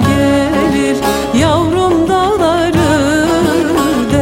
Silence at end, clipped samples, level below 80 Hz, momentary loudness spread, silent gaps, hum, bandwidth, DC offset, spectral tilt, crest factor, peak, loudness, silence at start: 0 s; under 0.1%; -32 dBFS; 2 LU; none; none; 16.5 kHz; under 0.1%; -5.5 dB/octave; 10 dB; 0 dBFS; -12 LUFS; 0 s